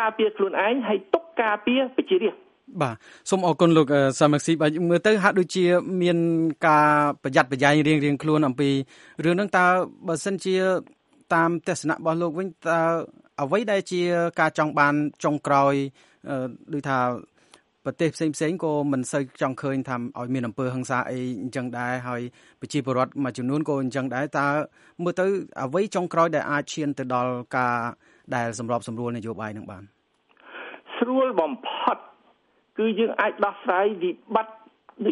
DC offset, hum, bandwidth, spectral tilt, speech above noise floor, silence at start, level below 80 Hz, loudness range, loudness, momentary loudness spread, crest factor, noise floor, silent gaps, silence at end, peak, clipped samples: under 0.1%; none; 11.5 kHz; -5.5 dB/octave; 40 dB; 0 s; -68 dBFS; 8 LU; -24 LUFS; 11 LU; 22 dB; -63 dBFS; none; 0 s; -2 dBFS; under 0.1%